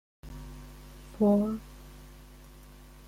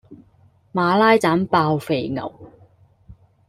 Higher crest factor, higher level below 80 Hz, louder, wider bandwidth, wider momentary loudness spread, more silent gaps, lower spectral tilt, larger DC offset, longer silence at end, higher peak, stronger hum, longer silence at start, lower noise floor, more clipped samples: about the same, 18 dB vs 18 dB; first, -50 dBFS vs -56 dBFS; second, -28 LUFS vs -19 LUFS; about the same, 15.5 kHz vs 15 kHz; first, 27 LU vs 14 LU; neither; first, -8.5 dB/octave vs -6.5 dB/octave; neither; first, 1 s vs 0.35 s; second, -16 dBFS vs -2 dBFS; first, 50 Hz at -45 dBFS vs none; first, 0.25 s vs 0.1 s; second, -51 dBFS vs -55 dBFS; neither